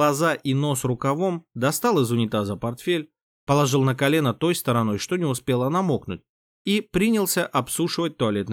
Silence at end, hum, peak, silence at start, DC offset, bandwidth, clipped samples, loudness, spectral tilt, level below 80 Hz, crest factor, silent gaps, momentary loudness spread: 0 s; none; -8 dBFS; 0 s; under 0.1%; 18.5 kHz; under 0.1%; -23 LUFS; -5 dB/octave; -56 dBFS; 14 dB; 3.22-3.47 s, 6.29-6.65 s; 6 LU